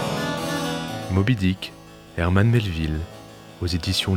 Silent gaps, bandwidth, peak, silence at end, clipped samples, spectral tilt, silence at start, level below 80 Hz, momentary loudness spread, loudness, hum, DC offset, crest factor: none; 16.5 kHz; -4 dBFS; 0 s; under 0.1%; -5.5 dB/octave; 0 s; -42 dBFS; 16 LU; -23 LUFS; none; under 0.1%; 20 dB